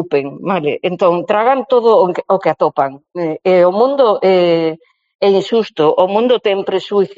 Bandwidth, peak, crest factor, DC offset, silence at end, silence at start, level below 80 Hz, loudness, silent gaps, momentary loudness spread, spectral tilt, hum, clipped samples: 7.6 kHz; 0 dBFS; 14 dB; under 0.1%; 0.05 s; 0 s; -62 dBFS; -14 LUFS; 5.15-5.19 s; 7 LU; -4 dB/octave; none; under 0.1%